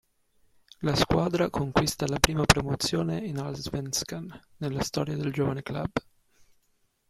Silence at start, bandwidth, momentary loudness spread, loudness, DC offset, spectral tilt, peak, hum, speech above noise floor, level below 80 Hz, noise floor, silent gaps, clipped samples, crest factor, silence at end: 0.8 s; 16 kHz; 11 LU; -28 LUFS; under 0.1%; -4.5 dB/octave; -2 dBFS; none; 43 dB; -46 dBFS; -70 dBFS; none; under 0.1%; 28 dB; 1.1 s